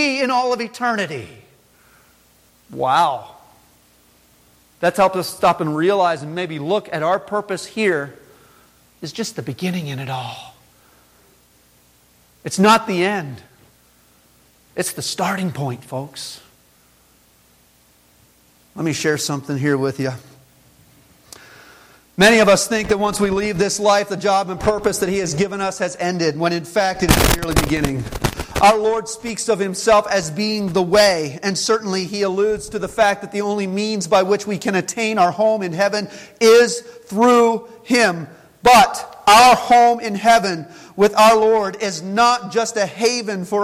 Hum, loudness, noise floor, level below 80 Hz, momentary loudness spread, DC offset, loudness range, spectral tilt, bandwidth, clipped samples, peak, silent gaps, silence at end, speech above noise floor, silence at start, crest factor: none; -17 LUFS; -54 dBFS; -40 dBFS; 14 LU; under 0.1%; 13 LU; -4 dB/octave; 16.5 kHz; under 0.1%; 0 dBFS; none; 0 s; 37 dB; 0 s; 18 dB